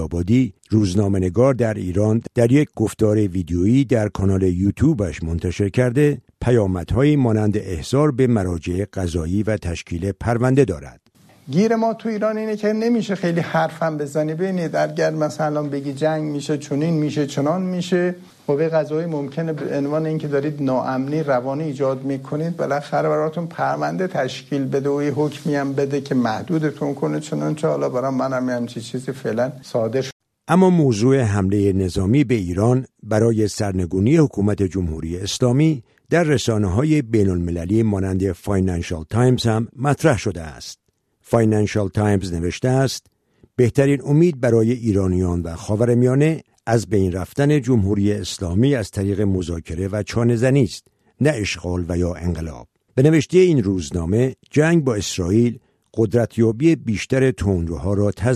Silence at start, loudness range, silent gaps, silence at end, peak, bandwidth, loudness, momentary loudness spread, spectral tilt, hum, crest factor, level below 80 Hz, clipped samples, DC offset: 0 s; 4 LU; 30.12-30.20 s; 0 s; -2 dBFS; 13.5 kHz; -20 LUFS; 8 LU; -7 dB/octave; none; 16 dB; -42 dBFS; under 0.1%; under 0.1%